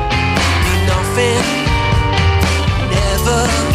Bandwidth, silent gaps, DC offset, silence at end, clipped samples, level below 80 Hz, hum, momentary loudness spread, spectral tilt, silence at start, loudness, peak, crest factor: 15.5 kHz; none; under 0.1%; 0 s; under 0.1%; -22 dBFS; none; 2 LU; -4.5 dB/octave; 0 s; -14 LUFS; -2 dBFS; 12 dB